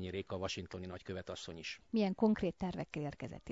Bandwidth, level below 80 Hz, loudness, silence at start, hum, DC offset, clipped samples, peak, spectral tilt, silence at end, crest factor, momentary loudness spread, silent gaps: 7.6 kHz; -62 dBFS; -39 LUFS; 0 s; none; under 0.1%; under 0.1%; -20 dBFS; -5.5 dB/octave; 0 s; 18 dB; 13 LU; none